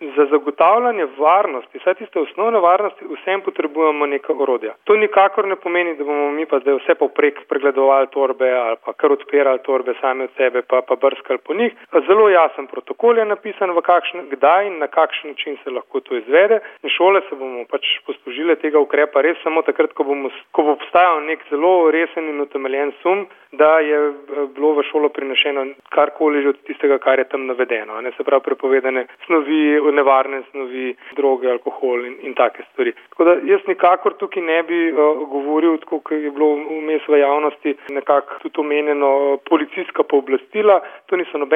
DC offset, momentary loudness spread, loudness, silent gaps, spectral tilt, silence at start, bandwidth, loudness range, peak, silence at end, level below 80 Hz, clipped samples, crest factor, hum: under 0.1%; 9 LU; -17 LUFS; none; -6.5 dB/octave; 0 s; 3.7 kHz; 2 LU; -2 dBFS; 0 s; -72 dBFS; under 0.1%; 16 dB; none